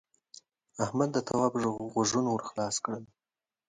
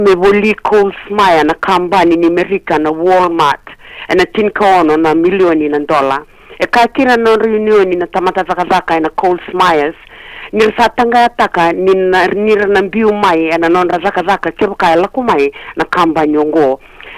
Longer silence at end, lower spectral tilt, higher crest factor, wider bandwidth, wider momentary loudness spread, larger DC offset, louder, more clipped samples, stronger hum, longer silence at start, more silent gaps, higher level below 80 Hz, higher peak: first, 0.65 s vs 0 s; about the same, -4.5 dB/octave vs -5.5 dB/octave; first, 20 dB vs 8 dB; second, 10.5 kHz vs 15 kHz; first, 9 LU vs 6 LU; neither; second, -31 LUFS vs -11 LUFS; neither; neither; first, 0.75 s vs 0 s; neither; second, -68 dBFS vs -42 dBFS; second, -12 dBFS vs -2 dBFS